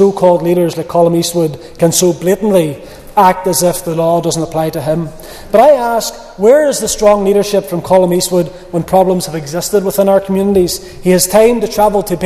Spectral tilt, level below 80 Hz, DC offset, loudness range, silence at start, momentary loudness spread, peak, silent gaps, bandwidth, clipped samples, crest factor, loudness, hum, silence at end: -5 dB/octave; -38 dBFS; under 0.1%; 2 LU; 0 s; 8 LU; 0 dBFS; none; 14.5 kHz; 0.3%; 12 dB; -12 LUFS; none; 0 s